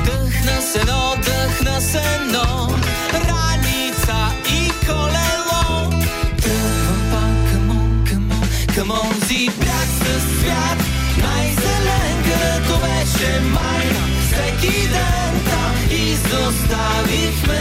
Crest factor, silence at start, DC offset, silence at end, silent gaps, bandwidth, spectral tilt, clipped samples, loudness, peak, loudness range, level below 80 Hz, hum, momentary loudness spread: 12 dB; 0 s; under 0.1%; 0 s; none; 16 kHz; -4 dB/octave; under 0.1%; -17 LUFS; -4 dBFS; 1 LU; -22 dBFS; none; 2 LU